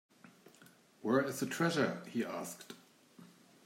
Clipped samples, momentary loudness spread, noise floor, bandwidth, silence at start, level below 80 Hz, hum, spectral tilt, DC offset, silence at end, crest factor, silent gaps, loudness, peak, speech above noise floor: under 0.1%; 17 LU; -63 dBFS; 16 kHz; 0.25 s; -84 dBFS; none; -5 dB/octave; under 0.1%; 0.4 s; 22 dB; none; -36 LUFS; -18 dBFS; 28 dB